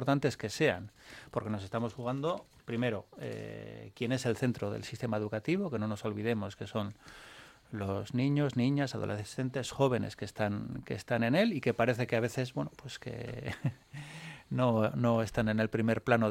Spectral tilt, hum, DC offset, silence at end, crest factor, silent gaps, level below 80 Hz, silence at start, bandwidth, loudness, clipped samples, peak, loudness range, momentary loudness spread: -6.5 dB/octave; none; under 0.1%; 0 s; 22 dB; none; -62 dBFS; 0 s; 15.5 kHz; -33 LUFS; under 0.1%; -10 dBFS; 4 LU; 15 LU